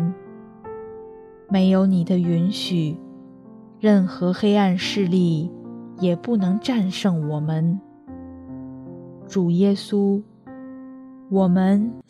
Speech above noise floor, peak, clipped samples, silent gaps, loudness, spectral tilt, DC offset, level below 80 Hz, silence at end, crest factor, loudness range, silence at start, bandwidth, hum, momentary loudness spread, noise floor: 25 dB; -4 dBFS; under 0.1%; none; -21 LUFS; -7.5 dB/octave; under 0.1%; -64 dBFS; 0.1 s; 16 dB; 4 LU; 0 s; 11 kHz; none; 21 LU; -44 dBFS